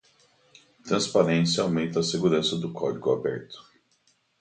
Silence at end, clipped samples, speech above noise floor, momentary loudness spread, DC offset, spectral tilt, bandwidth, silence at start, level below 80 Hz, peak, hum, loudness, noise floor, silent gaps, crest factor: 0.8 s; under 0.1%; 42 dB; 15 LU; under 0.1%; -5 dB/octave; 9.4 kHz; 0.85 s; -62 dBFS; -6 dBFS; none; -25 LUFS; -68 dBFS; none; 22 dB